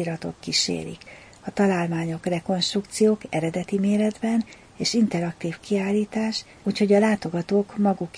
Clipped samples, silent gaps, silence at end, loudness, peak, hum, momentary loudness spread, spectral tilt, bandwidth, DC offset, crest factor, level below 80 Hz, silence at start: under 0.1%; none; 0 s; -24 LUFS; -8 dBFS; none; 10 LU; -5 dB/octave; 10.5 kHz; under 0.1%; 16 dB; -58 dBFS; 0 s